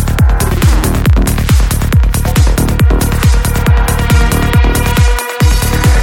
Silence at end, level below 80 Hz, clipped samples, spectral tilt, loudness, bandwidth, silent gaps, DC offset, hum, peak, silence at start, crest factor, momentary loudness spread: 0 s; -12 dBFS; under 0.1%; -5.5 dB/octave; -11 LUFS; 17 kHz; none; under 0.1%; none; 0 dBFS; 0 s; 8 dB; 1 LU